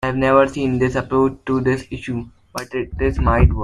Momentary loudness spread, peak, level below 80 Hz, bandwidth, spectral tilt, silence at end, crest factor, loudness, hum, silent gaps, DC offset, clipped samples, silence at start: 12 LU; -2 dBFS; -26 dBFS; 12.5 kHz; -7.5 dB/octave; 0 s; 16 dB; -19 LUFS; none; none; under 0.1%; under 0.1%; 0 s